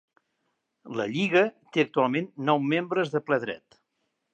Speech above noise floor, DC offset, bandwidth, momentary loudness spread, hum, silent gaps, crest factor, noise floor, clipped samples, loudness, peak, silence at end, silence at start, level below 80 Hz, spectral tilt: 52 dB; under 0.1%; 8.6 kHz; 10 LU; none; none; 20 dB; -78 dBFS; under 0.1%; -26 LUFS; -8 dBFS; 0.75 s; 0.85 s; -78 dBFS; -6.5 dB/octave